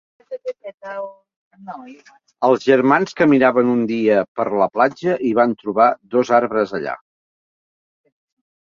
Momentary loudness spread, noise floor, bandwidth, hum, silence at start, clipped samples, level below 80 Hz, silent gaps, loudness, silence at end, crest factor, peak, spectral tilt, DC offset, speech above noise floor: 19 LU; under -90 dBFS; 7.4 kHz; none; 0.3 s; under 0.1%; -64 dBFS; 0.74-0.78 s, 1.36-1.51 s, 4.28-4.35 s; -17 LUFS; 1.7 s; 18 dB; -2 dBFS; -7 dB/octave; under 0.1%; over 73 dB